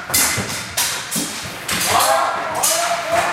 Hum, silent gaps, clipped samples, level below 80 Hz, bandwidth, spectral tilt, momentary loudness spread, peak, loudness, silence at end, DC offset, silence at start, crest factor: none; none; under 0.1%; -48 dBFS; 16.5 kHz; -1 dB/octave; 7 LU; 0 dBFS; -18 LUFS; 0 s; under 0.1%; 0 s; 20 dB